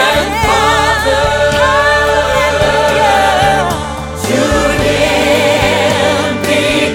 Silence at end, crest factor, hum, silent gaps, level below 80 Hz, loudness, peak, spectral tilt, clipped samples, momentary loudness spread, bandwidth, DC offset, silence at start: 0 s; 10 dB; none; none; -26 dBFS; -11 LUFS; 0 dBFS; -4 dB/octave; under 0.1%; 4 LU; 17.5 kHz; under 0.1%; 0 s